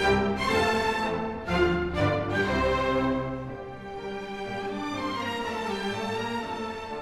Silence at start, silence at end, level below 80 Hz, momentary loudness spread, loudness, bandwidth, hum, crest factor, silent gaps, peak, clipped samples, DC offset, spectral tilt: 0 s; 0 s; -44 dBFS; 11 LU; -28 LUFS; 16 kHz; none; 16 dB; none; -12 dBFS; under 0.1%; under 0.1%; -5.5 dB/octave